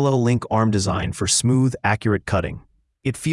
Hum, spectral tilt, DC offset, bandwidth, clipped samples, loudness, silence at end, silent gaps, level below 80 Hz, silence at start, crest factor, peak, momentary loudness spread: none; -5 dB/octave; under 0.1%; 12 kHz; under 0.1%; -20 LUFS; 0 s; none; -46 dBFS; 0 s; 16 dB; -4 dBFS; 11 LU